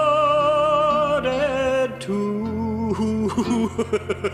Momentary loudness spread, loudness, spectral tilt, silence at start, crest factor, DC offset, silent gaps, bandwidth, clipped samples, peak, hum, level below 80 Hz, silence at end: 7 LU; -21 LUFS; -6 dB/octave; 0 s; 12 dB; under 0.1%; none; 12.5 kHz; under 0.1%; -10 dBFS; none; -46 dBFS; 0 s